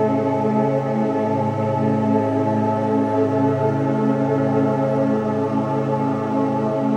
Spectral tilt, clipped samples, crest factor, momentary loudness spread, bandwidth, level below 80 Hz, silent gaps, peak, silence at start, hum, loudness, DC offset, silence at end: -9 dB/octave; under 0.1%; 14 dB; 2 LU; 8.6 kHz; -56 dBFS; none; -6 dBFS; 0 s; none; -20 LUFS; under 0.1%; 0 s